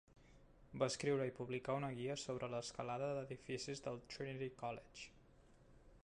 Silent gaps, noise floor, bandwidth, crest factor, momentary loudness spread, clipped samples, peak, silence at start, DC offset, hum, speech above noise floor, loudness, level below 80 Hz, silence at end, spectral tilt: none; -67 dBFS; 11 kHz; 22 dB; 10 LU; under 0.1%; -24 dBFS; 0.15 s; under 0.1%; none; 23 dB; -45 LUFS; -70 dBFS; 0.05 s; -5 dB/octave